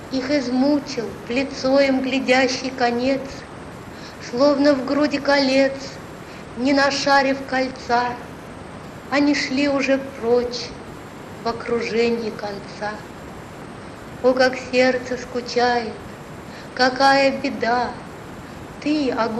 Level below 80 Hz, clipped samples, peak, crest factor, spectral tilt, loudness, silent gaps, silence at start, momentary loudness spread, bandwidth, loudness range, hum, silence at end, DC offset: -50 dBFS; under 0.1%; -4 dBFS; 18 dB; -4.5 dB/octave; -20 LUFS; none; 0 s; 19 LU; 12.5 kHz; 4 LU; none; 0 s; under 0.1%